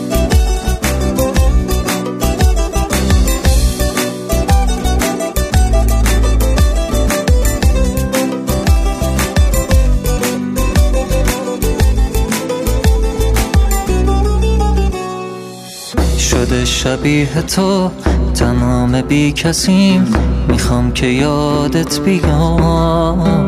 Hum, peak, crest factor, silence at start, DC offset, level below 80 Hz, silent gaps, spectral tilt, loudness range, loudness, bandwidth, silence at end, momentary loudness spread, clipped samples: none; 0 dBFS; 12 dB; 0 s; under 0.1%; -16 dBFS; none; -5.5 dB/octave; 2 LU; -14 LUFS; 15.5 kHz; 0 s; 4 LU; under 0.1%